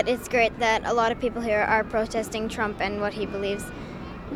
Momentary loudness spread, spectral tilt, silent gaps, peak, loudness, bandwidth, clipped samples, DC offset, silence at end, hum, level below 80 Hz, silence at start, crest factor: 11 LU; -4.5 dB/octave; none; -8 dBFS; -25 LUFS; 16.5 kHz; under 0.1%; under 0.1%; 0 s; none; -46 dBFS; 0 s; 18 dB